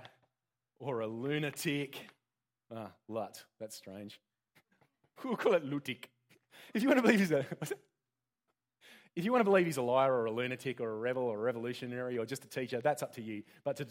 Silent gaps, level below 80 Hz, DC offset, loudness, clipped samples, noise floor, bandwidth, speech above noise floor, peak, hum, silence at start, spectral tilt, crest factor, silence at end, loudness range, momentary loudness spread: none; -84 dBFS; under 0.1%; -34 LUFS; under 0.1%; under -90 dBFS; 16.5 kHz; over 56 dB; -12 dBFS; none; 0 s; -5.5 dB/octave; 24 dB; 0 s; 9 LU; 19 LU